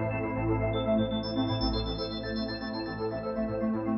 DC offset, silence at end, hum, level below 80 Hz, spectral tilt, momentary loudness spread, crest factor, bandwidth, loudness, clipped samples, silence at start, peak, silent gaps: under 0.1%; 0 s; none; -42 dBFS; -9.5 dB/octave; 6 LU; 14 dB; 5.8 kHz; -31 LUFS; under 0.1%; 0 s; -16 dBFS; none